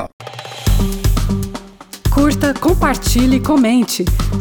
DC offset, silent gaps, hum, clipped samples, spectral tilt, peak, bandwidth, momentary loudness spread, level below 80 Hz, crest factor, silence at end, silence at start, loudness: under 0.1%; 0.13-0.19 s; none; under 0.1%; -5.5 dB/octave; -4 dBFS; 19.5 kHz; 16 LU; -20 dBFS; 10 dB; 0 s; 0 s; -15 LUFS